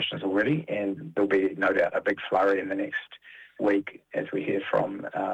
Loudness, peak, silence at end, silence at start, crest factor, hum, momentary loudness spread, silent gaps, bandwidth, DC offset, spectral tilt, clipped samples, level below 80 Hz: -27 LUFS; -10 dBFS; 0 s; 0 s; 16 dB; none; 10 LU; none; 8 kHz; under 0.1%; -7 dB/octave; under 0.1%; -70 dBFS